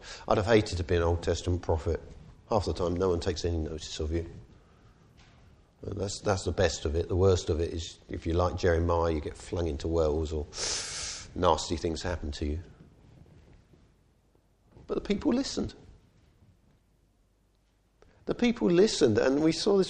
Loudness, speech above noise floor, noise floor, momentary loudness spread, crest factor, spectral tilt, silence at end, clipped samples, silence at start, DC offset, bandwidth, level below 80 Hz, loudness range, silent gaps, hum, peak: -29 LUFS; 40 dB; -68 dBFS; 12 LU; 22 dB; -5.5 dB/octave; 0 s; under 0.1%; 0 s; under 0.1%; 11 kHz; -42 dBFS; 7 LU; none; none; -8 dBFS